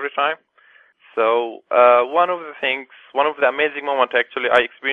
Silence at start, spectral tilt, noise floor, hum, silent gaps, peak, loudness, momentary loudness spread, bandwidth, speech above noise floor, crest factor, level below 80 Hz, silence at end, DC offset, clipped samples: 0 s; -4.5 dB/octave; -53 dBFS; none; none; 0 dBFS; -18 LUFS; 9 LU; 4.7 kHz; 35 dB; 18 dB; -66 dBFS; 0 s; under 0.1%; under 0.1%